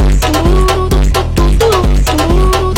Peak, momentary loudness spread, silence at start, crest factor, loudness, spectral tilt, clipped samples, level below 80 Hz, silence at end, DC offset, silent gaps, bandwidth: 0 dBFS; 2 LU; 0 s; 8 dB; -11 LUFS; -5.5 dB/octave; under 0.1%; -12 dBFS; 0 s; under 0.1%; none; 16.5 kHz